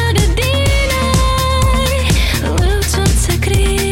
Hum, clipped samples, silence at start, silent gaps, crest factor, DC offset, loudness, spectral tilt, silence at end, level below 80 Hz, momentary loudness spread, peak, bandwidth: none; under 0.1%; 0 s; none; 10 dB; under 0.1%; -14 LUFS; -4.5 dB/octave; 0 s; -16 dBFS; 1 LU; -4 dBFS; 17 kHz